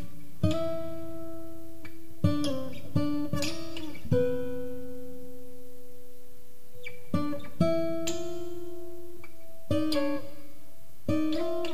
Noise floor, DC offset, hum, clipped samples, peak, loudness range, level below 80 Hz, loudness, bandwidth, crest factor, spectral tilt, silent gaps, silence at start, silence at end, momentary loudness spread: -56 dBFS; 4%; none; under 0.1%; -12 dBFS; 4 LU; -54 dBFS; -32 LUFS; 15.5 kHz; 22 dB; -6 dB/octave; none; 0 s; 0 s; 21 LU